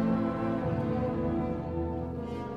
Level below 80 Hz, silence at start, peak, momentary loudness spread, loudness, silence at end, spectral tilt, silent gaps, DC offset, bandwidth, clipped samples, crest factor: -46 dBFS; 0 s; -18 dBFS; 6 LU; -32 LUFS; 0 s; -9.5 dB/octave; none; 0.1%; 6.6 kHz; under 0.1%; 14 dB